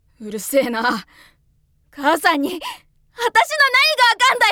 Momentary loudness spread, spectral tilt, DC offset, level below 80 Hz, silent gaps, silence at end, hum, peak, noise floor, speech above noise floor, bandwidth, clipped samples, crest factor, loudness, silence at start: 16 LU; -1.5 dB/octave; under 0.1%; -58 dBFS; none; 0 s; none; -2 dBFS; -60 dBFS; 42 dB; 19.5 kHz; under 0.1%; 18 dB; -16 LUFS; 0.2 s